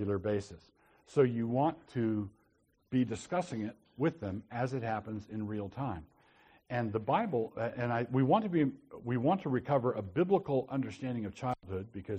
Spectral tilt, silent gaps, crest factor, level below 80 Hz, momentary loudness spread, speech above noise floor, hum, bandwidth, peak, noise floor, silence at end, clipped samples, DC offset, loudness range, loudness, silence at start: -8 dB/octave; none; 18 dB; -66 dBFS; 10 LU; 39 dB; none; 9.4 kHz; -16 dBFS; -72 dBFS; 0 s; under 0.1%; under 0.1%; 6 LU; -34 LUFS; 0 s